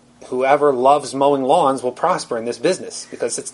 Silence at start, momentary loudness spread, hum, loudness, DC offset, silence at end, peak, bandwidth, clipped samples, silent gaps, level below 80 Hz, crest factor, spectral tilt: 0.2 s; 10 LU; none; -18 LUFS; under 0.1%; 0.05 s; 0 dBFS; 11.5 kHz; under 0.1%; none; -64 dBFS; 18 dB; -4 dB/octave